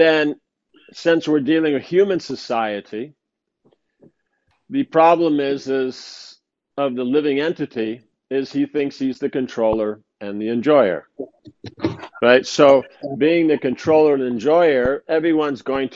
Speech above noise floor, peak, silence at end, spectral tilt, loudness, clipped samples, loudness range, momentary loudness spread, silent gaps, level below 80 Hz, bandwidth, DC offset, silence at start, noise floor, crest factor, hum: 50 dB; 0 dBFS; 0 s; -5.5 dB/octave; -19 LUFS; under 0.1%; 7 LU; 16 LU; none; -54 dBFS; 7.8 kHz; under 0.1%; 0 s; -68 dBFS; 18 dB; none